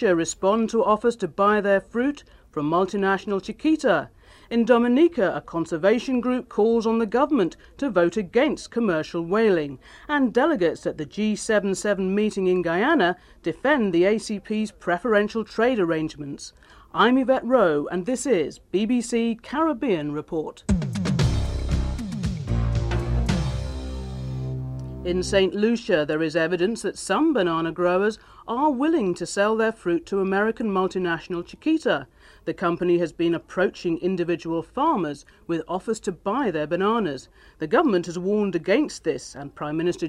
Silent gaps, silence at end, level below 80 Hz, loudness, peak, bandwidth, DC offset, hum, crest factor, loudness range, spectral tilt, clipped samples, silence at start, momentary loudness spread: none; 0 s; -38 dBFS; -23 LUFS; -6 dBFS; 12 kHz; under 0.1%; none; 18 dB; 3 LU; -6 dB/octave; under 0.1%; 0 s; 10 LU